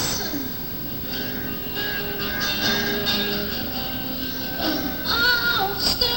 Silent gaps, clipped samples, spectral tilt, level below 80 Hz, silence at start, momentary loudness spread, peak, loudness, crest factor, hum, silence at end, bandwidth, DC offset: none; under 0.1%; -3 dB/octave; -42 dBFS; 0 s; 7 LU; -8 dBFS; -23 LUFS; 16 dB; none; 0 s; over 20 kHz; 0.5%